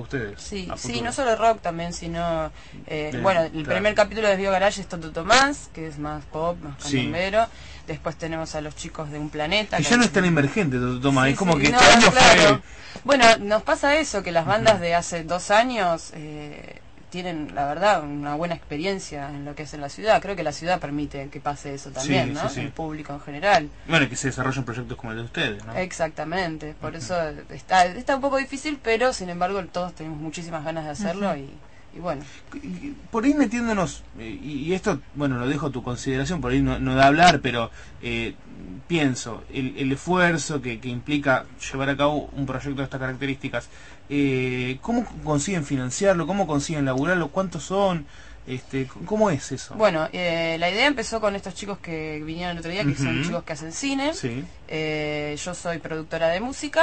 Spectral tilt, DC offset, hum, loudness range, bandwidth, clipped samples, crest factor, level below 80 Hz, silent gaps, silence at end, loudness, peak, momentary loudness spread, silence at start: -4.5 dB/octave; 0.5%; none; 10 LU; 8.8 kHz; under 0.1%; 22 dB; -44 dBFS; none; 0 s; -23 LUFS; -2 dBFS; 14 LU; 0 s